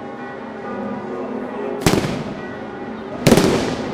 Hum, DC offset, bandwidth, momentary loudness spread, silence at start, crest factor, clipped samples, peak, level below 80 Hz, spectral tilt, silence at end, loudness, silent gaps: none; under 0.1%; 16 kHz; 16 LU; 0 s; 20 dB; under 0.1%; 0 dBFS; -40 dBFS; -5 dB/octave; 0 s; -21 LUFS; none